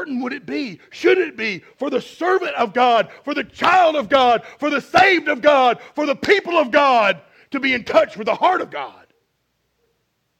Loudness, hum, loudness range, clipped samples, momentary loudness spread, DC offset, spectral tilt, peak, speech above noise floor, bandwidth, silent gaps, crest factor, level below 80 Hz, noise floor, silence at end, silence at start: -17 LUFS; none; 4 LU; under 0.1%; 12 LU; under 0.1%; -4 dB/octave; 0 dBFS; 52 dB; 15 kHz; none; 18 dB; -60 dBFS; -70 dBFS; 1.5 s; 0 s